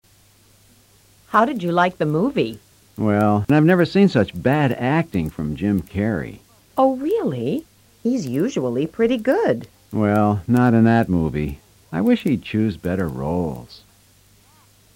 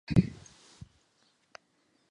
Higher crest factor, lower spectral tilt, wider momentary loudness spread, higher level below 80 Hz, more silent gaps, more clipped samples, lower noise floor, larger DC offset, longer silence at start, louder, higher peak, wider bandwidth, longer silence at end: second, 16 dB vs 26 dB; about the same, -7.5 dB/octave vs -8 dB/octave; second, 11 LU vs 27 LU; about the same, -46 dBFS vs -50 dBFS; neither; neither; second, -54 dBFS vs -72 dBFS; neither; first, 1.3 s vs 0.1 s; first, -20 LUFS vs -30 LUFS; first, -4 dBFS vs -8 dBFS; first, 16.5 kHz vs 11 kHz; second, 1.2 s vs 1.8 s